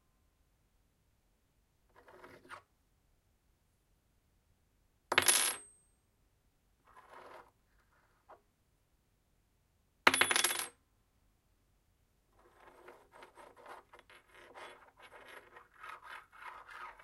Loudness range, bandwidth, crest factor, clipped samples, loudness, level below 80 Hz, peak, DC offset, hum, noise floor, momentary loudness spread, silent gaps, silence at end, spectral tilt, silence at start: 21 LU; 16 kHz; 34 dB; under 0.1%; -30 LUFS; -76 dBFS; -8 dBFS; under 0.1%; none; -75 dBFS; 28 LU; none; 0.1 s; 0.5 dB/octave; 2.25 s